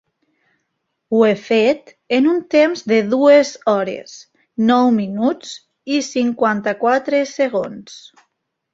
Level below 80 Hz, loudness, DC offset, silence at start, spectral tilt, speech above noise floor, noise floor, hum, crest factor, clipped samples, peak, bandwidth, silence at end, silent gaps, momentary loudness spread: -64 dBFS; -16 LUFS; under 0.1%; 1.1 s; -5 dB/octave; 57 dB; -73 dBFS; none; 16 dB; under 0.1%; -2 dBFS; 7.8 kHz; 0.75 s; none; 16 LU